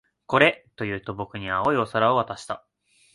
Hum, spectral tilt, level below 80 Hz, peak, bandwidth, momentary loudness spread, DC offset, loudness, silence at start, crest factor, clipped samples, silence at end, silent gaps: none; -5.5 dB/octave; -56 dBFS; -4 dBFS; 11.5 kHz; 14 LU; under 0.1%; -24 LUFS; 0.3 s; 22 dB; under 0.1%; 0.55 s; none